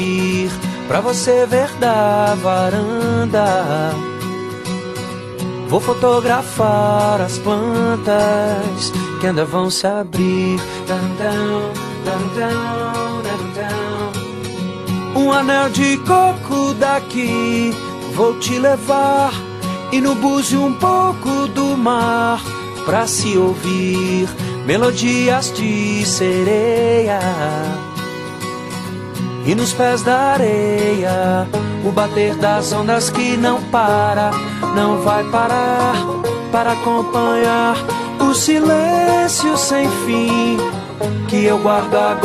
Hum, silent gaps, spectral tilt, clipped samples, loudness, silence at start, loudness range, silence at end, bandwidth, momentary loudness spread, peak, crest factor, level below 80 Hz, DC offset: none; none; -5 dB/octave; under 0.1%; -16 LUFS; 0 s; 4 LU; 0 s; 13 kHz; 10 LU; -2 dBFS; 14 dB; -48 dBFS; under 0.1%